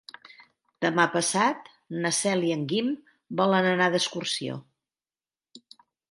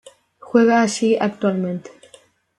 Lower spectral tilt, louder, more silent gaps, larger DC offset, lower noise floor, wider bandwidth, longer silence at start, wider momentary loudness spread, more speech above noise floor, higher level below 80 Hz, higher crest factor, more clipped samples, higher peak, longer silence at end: second, -3.5 dB/octave vs -5.5 dB/octave; second, -25 LUFS vs -18 LUFS; neither; neither; first, under -90 dBFS vs -51 dBFS; about the same, 11.5 kHz vs 11 kHz; first, 0.8 s vs 0.45 s; first, 14 LU vs 11 LU; first, over 65 dB vs 34 dB; second, -76 dBFS vs -66 dBFS; first, 22 dB vs 16 dB; neither; about the same, -6 dBFS vs -4 dBFS; second, 0.55 s vs 0.7 s